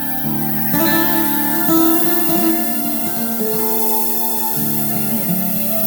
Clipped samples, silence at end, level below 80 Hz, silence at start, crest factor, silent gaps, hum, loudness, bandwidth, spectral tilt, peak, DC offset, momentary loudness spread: under 0.1%; 0 s; -54 dBFS; 0 s; 14 dB; none; none; -14 LUFS; over 20 kHz; -4 dB/octave; -2 dBFS; under 0.1%; 5 LU